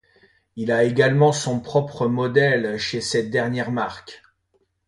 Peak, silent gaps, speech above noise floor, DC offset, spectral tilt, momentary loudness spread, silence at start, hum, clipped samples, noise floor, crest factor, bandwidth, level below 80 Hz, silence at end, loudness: -4 dBFS; none; 47 dB; under 0.1%; -5.5 dB/octave; 10 LU; 0.55 s; none; under 0.1%; -68 dBFS; 18 dB; 11.5 kHz; -58 dBFS; 0.7 s; -21 LUFS